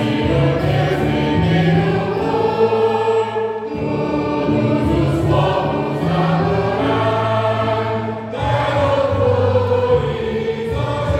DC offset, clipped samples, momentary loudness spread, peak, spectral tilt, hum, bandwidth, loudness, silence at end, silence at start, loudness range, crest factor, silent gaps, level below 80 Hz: under 0.1%; under 0.1%; 6 LU; -4 dBFS; -8 dB/octave; none; 11.5 kHz; -17 LUFS; 0 s; 0 s; 1 LU; 14 dB; none; -34 dBFS